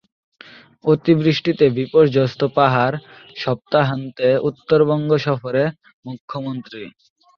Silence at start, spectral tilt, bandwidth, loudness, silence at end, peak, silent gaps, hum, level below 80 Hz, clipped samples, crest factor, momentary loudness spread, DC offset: 0.85 s; -8 dB/octave; 6.6 kHz; -18 LUFS; 0.5 s; -2 dBFS; 5.94-6.03 s, 6.20-6.28 s; none; -58 dBFS; under 0.1%; 16 dB; 18 LU; under 0.1%